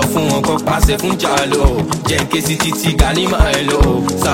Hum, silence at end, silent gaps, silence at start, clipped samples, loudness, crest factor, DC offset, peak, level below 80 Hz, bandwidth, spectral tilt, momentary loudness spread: none; 0 s; none; 0 s; under 0.1%; -14 LUFS; 14 dB; 0.2%; 0 dBFS; -20 dBFS; 16.5 kHz; -4.5 dB/octave; 2 LU